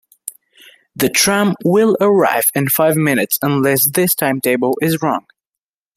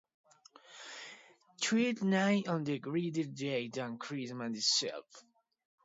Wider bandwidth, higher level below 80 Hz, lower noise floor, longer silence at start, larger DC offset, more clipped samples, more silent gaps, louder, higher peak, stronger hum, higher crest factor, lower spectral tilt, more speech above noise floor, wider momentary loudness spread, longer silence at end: first, 16 kHz vs 7.8 kHz; first, -56 dBFS vs -84 dBFS; first, -86 dBFS vs -60 dBFS; second, 0.25 s vs 0.7 s; neither; neither; neither; first, -14 LUFS vs -34 LUFS; first, 0 dBFS vs -16 dBFS; neither; about the same, 16 dB vs 20 dB; about the same, -4 dB/octave vs -4 dB/octave; first, 72 dB vs 26 dB; second, 8 LU vs 18 LU; about the same, 0.75 s vs 0.65 s